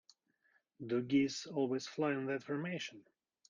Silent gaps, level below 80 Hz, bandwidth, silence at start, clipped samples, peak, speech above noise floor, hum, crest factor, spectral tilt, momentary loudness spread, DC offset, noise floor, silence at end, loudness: none; -78 dBFS; 7.6 kHz; 0.8 s; under 0.1%; -22 dBFS; 40 dB; none; 18 dB; -5.5 dB/octave; 9 LU; under 0.1%; -77 dBFS; 0.5 s; -37 LUFS